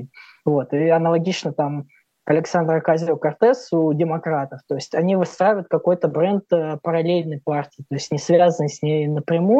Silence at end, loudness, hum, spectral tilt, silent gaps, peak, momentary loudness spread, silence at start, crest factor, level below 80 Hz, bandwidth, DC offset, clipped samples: 0 s; -20 LUFS; none; -7 dB/octave; none; -2 dBFS; 8 LU; 0 s; 16 dB; -76 dBFS; 8.2 kHz; under 0.1%; under 0.1%